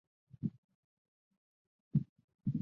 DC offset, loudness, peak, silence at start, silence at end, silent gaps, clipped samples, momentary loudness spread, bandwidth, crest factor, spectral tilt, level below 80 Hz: under 0.1%; -40 LUFS; -20 dBFS; 0.4 s; 0 s; 0.58-0.69 s, 0.75-1.31 s, 1.37-1.91 s, 2.09-2.16 s, 2.24-2.28 s, 2.35-2.39 s; under 0.1%; 6 LU; 1.6 kHz; 22 dB; -14 dB/octave; -70 dBFS